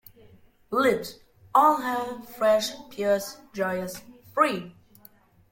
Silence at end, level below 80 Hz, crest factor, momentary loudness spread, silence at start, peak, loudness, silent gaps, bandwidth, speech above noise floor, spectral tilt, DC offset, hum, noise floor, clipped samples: 0.8 s; -66 dBFS; 20 dB; 16 LU; 0.7 s; -6 dBFS; -25 LUFS; none; 17 kHz; 31 dB; -4 dB/octave; under 0.1%; none; -56 dBFS; under 0.1%